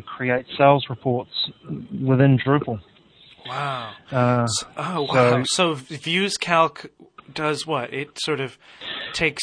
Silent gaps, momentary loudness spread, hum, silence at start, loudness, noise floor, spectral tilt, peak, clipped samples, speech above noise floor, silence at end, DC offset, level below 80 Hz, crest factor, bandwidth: none; 15 LU; none; 0.05 s; -22 LUFS; -52 dBFS; -5 dB/octave; 0 dBFS; under 0.1%; 30 dB; 0 s; under 0.1%; -58 dBFS; 22 dB; 10.5 kHz